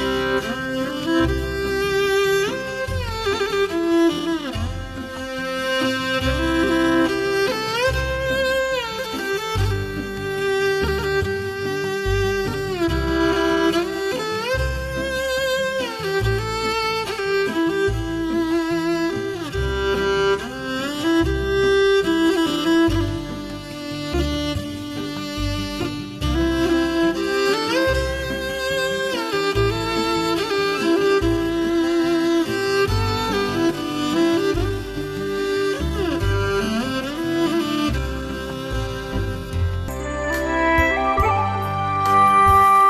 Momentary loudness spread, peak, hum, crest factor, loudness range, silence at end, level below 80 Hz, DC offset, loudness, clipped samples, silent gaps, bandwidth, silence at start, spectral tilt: 8 LU; -4 dBFS; none; 16 dB; 3 LU; 0 s; -34 dBFS; under 0.1%; -21 LUFS; under 0.1%; none; 14 kHz; 0 s; -5 dB/octave